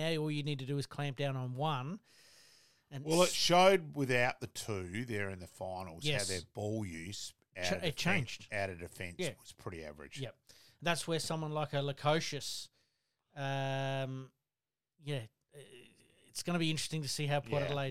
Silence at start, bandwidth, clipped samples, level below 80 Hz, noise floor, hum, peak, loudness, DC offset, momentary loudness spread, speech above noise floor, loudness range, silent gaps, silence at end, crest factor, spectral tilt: 0 s; 16 kHz; under 0.1%; -66 dBFS; under -90 dBFS; none; -14 dBFS; -36 LUFS; under 0.1%; 15 LU; over 54 dB; 9 LU; none; 0 s; 24 dB; -4.5 dB/octave